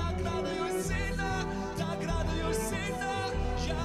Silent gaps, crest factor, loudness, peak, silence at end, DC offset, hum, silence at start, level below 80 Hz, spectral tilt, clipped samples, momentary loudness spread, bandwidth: none; 14 dB; -33 LUFS; -18 dBFS; 0 s; under 0.1%; none; 0 s; -38 dBFS; -5 dB/octave; under 0.1%; 2 LU; 15 kHz